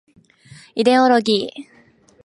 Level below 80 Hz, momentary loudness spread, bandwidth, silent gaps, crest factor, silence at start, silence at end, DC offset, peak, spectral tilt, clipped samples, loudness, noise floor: -68 dBFS; 17 LU; 11.5 kHz; none; 18 dB; 0.75 s; 0.65 s; under 0.1%; -2 dBFS; -4.5 dB/octave; under 0.1%; -16 LUFS; -53 dBFS